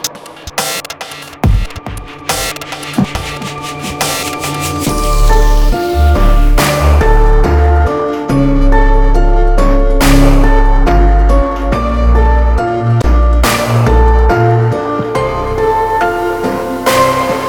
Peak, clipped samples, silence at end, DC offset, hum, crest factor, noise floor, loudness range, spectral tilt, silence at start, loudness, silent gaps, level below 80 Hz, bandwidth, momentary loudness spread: 0 dBFS; under 0.1%; 0 s; under 0.1%; none; 10 dB; -29 dBFS; 6 LU; -5.5 dB/octave; 0 s; -12 LUFS; none; -12 dBFS; 18.5 kHz; 10 LU